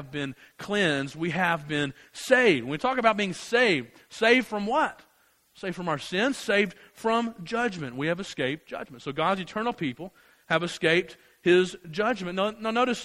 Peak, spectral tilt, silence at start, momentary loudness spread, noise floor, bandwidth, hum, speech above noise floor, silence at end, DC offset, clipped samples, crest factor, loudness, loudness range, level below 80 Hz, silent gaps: -6 dBFS; -4.5 dB/octave; 0 s; 13 LU; -64 dBFS; 15 kHz; none; 38 dB; 0 s; under 0.1%; under 0.1%; 22 dB; -26 LUFS; 5 LU; -64 dBFS; none